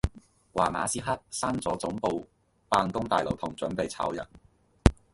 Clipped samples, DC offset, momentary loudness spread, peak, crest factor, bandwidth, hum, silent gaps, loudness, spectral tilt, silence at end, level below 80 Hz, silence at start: under 0.1%; under 0.1%; 9 LU; 0 dBFS; 30 dB; 11.5 kHz; none; none; -30 LUFS; -5 dB/octave; 0.2 s; -38 dBFS; 0.05 s